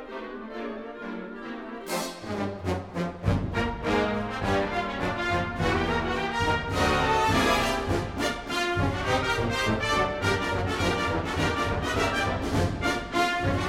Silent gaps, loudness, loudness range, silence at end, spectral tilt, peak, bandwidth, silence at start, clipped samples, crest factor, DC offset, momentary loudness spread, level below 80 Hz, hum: none; -27 LUFS; 5 LU; 0 s; -5 dB/octave; -10 dBFS; 16 kHz; 0 s; under 0.1%; 16 dB; under 0.1%; 12 LU; -40 dBFS; none